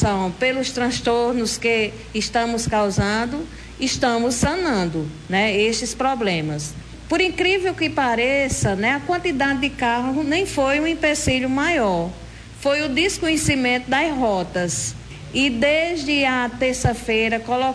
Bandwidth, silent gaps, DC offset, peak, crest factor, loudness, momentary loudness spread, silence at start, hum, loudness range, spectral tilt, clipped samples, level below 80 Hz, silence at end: 11 kHz; none; under 0.1%; -6 dBFS; 16 dB; -20 LUFS; 7 LU; 0 s; none; 1 LU; -4 dB/octave; under 0.1%; -40 dBFS; 0 s